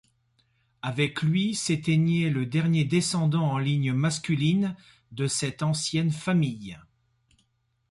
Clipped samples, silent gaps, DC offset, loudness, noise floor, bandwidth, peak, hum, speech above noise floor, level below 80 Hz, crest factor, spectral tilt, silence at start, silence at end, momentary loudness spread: under 0.1%; none; under 0.1%; -26 LUFS; -72 dBFS; 11.5 kHz; -12 dBFS; none; 47 dB; -62 dBFS; 16 dB; -5.5 dB/octave; 0.85 s; 1.1 s; 8 LU